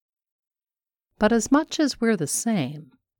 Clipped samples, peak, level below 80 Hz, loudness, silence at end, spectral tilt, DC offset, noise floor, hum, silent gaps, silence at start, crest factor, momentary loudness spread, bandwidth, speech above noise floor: under 0.1%; -6 dBFS; -54 dBFS; -23 LUFS; 0.35 s; -4 dB/octave; under 0.1%; -82 dBFS; none; none; 1.2 s; 18 dB; 8 LU; 19 kHz; 60 dB